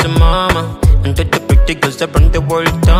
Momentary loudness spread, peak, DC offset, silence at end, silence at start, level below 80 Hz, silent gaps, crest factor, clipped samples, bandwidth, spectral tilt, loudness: 4 LU; 0 dBFS; under 0.1%; 0 s; 0 s; -14 dBFS; none; 10 dB; under 0.1%; 16 kHz; -6 dB/octave; -13 LUFS